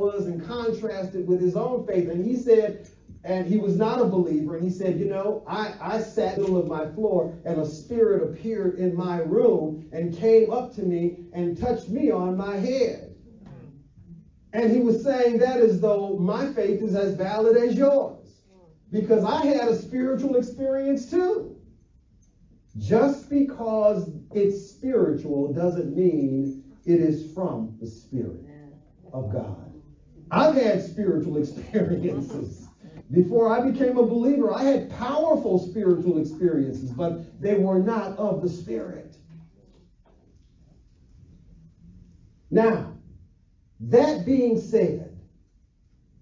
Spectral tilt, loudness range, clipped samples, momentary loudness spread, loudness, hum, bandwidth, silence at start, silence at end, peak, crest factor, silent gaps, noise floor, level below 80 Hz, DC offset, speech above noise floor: -8 dB/octave; 5 LU; under 0.1%; 11 LU; -24 LUFS; none; 7.6 kHz; 0 s; 1 s; -6 dBFS; 18 dB; none; -60 dBFS; -54 dBFS; under 0.1%; 37 dB